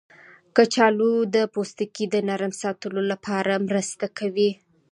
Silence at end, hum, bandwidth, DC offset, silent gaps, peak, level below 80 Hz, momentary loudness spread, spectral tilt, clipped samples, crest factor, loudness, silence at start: 0.4 s; none; 11.5 kHz; under 0.1%; none; -2 dBFS; -72 dBFS; 10 LU; -4.5 dB/octave; under 0.1%; 20 dB; -23 LUFS; 0.55 s